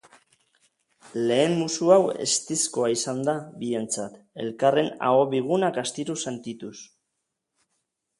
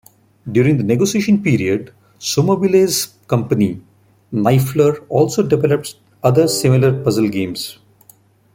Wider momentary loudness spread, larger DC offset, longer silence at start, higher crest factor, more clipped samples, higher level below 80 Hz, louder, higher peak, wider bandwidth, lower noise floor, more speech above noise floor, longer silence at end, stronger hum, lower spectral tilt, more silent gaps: first, 15 LU vs 10 LU; neither; first, 1.05 s vs 0.45 s; first, 22 dB vs 14 dB; neither; second, -72 dBFS vs -52 dBFS; second, -24 LUFS vs -16 LUFS; about the same, -4 dBFS vs -2 dBFS; second, 11.5 kHz vs 16.5 kHz; first, -80 dBFS vs -50 dBFS; first, 56 dB vs 35 dB; first, 1.35 s vs 0.85 s; neither; second, -4 dB/octave vs -6 dB/octave; neither